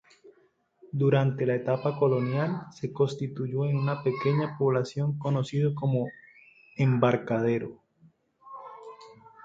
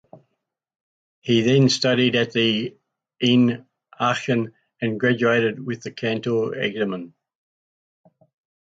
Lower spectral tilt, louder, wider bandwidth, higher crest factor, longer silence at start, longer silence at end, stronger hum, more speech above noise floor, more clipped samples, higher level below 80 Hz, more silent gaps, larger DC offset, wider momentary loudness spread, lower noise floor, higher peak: first, -8.5 dB/octave vs -5.5 dB/octave; second, -28 LUFS vs -21 LUFS; about the same, 7.6 kHz vs 7.8 kHz; about the same, 20 dB vs 16 dB; about the same, 0.25 s vs 0.15 s; second, 0.3 s vs 1.55 s; neither; second, 40 dB vs 58 dB; neither; about the same, -66 dBFS vs -64 dBFS; second, none vs 0.81-1.22 s; neither; first, 18 LU vs 13 LU; second, -66 dBFS vs -78 dBFS; about the same, -8 dBFS vs -6 dBFS